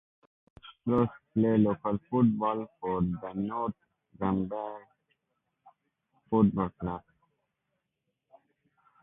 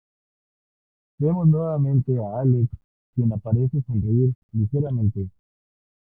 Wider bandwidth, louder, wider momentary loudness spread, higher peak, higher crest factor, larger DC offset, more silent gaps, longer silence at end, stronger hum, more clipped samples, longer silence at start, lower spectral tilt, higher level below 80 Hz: first, 3.8 kHz vs 1.6 kHz; second, -30 LUFS vs -23 LUFS; first, 12 LU vs 6 LU; second, -12 dBFS vs -8 dBFS; about the same, 20 dB vs 16 dB; neither; second, none vs 2.84-3.13 s, 4.35-4.49 s; first, 2.05 s vs 0.75 s; neither; neither; second, 0.65 s vs 1.2 s; second, -11.5 dB/octave vs -15 dB/octave; second, -58 dBFS vs -52 dBFS